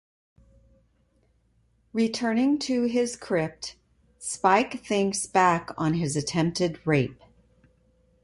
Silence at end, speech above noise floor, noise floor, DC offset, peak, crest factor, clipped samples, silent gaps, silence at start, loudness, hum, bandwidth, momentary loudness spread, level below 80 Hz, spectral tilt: 1.1 s; 41 dB; -66 dBFS; under 0.1%; -6 dBFS; 20 dB; under 0.1%; none; 1.95 s; -25 LUFS; none; 11.5 kHz; 11 LU; -60 dBFS; -5 dB/octave